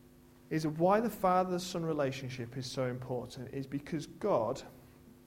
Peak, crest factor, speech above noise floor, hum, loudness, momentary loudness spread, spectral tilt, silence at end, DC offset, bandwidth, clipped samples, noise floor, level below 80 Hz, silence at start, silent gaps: -16 dBFS; 20 dB; 25 dB; none; -34 LUFS; 12 LU; -6 dB/octave; 0.15 s; under 0.1%; 16.5 kHz; under 0.1%; -59 dBFS; -64 dBFS; 0.05 s; none